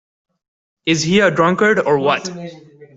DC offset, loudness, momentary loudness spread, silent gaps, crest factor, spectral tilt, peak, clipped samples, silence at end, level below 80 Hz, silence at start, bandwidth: under 0.1%; -15 LUFS; 16 LU; none; 14 dB; -4.5 dB/octave; -2 dBFS; under 0.1%; 0.1 s; -56 dBFS; 0.85 s; 8 kHz